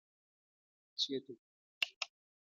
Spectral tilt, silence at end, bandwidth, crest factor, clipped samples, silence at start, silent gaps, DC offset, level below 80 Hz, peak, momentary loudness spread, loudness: -1.5 dB/octave; 0.35 s; 12.5 kHz; 30 dB; under 0.1%; 0.95 s; 1.39-1.81 s, 1.96-2.01 s; under 0.1%; under -90 dBFS; -16 dBFS; 17 LU; -40 LUFS